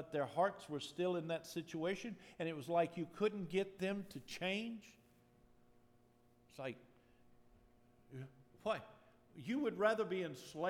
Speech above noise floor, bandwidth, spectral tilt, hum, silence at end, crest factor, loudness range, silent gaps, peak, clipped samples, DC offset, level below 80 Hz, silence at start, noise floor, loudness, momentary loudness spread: 30 dB; 17.5 kHz; -5.5 dB/octave; none; 0 s; 22 dB; 16 LU; none; -22 dBFS; under 0.1%; under 0.1%; -78 dBFS; 0 s; -70 dBFS; -41 LUFS; 17 LU